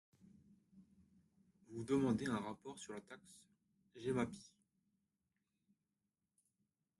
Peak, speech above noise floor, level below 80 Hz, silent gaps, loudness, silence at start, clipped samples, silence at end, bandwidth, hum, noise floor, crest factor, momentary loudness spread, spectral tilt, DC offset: -26 dBFS; over 48 dB; -76 dBFS; none; -42 LUFS; 0.75 s; under 0.1%; 2.55 s; 12 kHz; none; under -90 dBFS; 20 dB; 21 LU; -6 dB/octave; under 0.1%